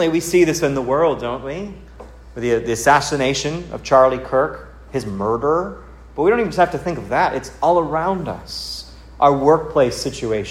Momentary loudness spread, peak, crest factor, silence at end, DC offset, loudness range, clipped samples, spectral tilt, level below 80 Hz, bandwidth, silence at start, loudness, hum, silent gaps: 14 LU; 0 dBFS; 18 dB; 0 s; under 0.1%; 2 LU; under 0.1%; -5 dB/octave; -42 dBFS; 16 kHz; 0 s; -18 LUFS; none; none